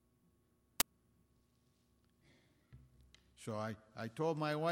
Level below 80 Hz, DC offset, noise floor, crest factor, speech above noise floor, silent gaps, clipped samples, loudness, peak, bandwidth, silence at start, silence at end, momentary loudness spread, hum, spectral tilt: -72 dBFS; under 0.1%; -75 dBFS; 36 dB; 36 dB; none; under 0.1%; -40 LUFS; -8 dBFS; 16.5 kHz; 0.8 s; 0 s; 11 LU; none; -4 dB/octave